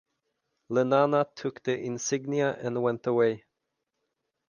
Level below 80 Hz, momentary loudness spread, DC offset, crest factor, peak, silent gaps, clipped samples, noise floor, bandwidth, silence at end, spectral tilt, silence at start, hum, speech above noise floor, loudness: -74 dBFS; 8 LU; under 0.1%; 20 dB; -10 dBFS; none; under 0.1%; -83 dBFS; 10 kHz; 1.1 s; -5 dB/octave; 0.7 s; none; 56 dB; -28 LUFS